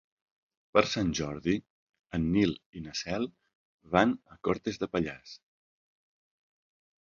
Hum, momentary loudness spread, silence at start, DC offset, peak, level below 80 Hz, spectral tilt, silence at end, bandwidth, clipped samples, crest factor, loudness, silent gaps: none; 12 LU; 0.75 s; under 0.1%; -6 dBFS; -54 dBFS; -5.5 dB/octave; 1.65 s; 7.6 kHz; under 0.1%; 26 dB; -31 LUFS; 1.70-1.87 s, 2.66-2.73 s, 3.55-3.79 s